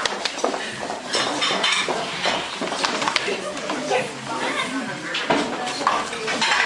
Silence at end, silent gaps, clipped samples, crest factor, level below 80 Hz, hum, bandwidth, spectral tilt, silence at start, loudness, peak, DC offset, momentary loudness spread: 0 s; none; under 0.1%; 22 dB; -62 dBFS; none; 11.5 kHz; -2 dB/octave; 0 s; -23 LUFS; -2 dBFS; under 0.1%; 7 LU